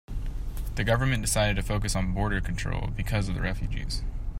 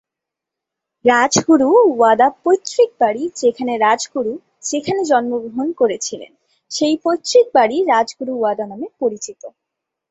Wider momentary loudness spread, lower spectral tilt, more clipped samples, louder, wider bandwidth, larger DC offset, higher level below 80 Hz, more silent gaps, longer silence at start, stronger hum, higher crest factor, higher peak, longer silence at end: about the same, 10 LU vs 12 LU; about the same, -4.5 dB/octave vs -3.5 dB/octave; neither; second, -29 LUFS vs -16 LUFS; first, 16 kHz vs 8.2 kHz; neither; first, -32 dBFS vs -64 dBFS; neither; second, 0.1 s vs 1.05 s; neither; about the same, 16 dB vs 16 dB; second, -10 dBFS vs -2 dBFS; second, 0 s vs 0.6 s